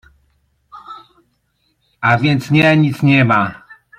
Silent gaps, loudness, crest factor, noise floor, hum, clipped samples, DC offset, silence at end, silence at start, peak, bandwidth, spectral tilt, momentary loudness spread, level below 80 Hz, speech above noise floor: none; -13 LUFS; 16 dB; -64 dBFS; none; under 0.1%; under 0.1%; 0.45 s; 0.75 s; 0 dBFS; 14 kHz; -7 dB/octave; 24 LU; -52 dBFS; 52 dB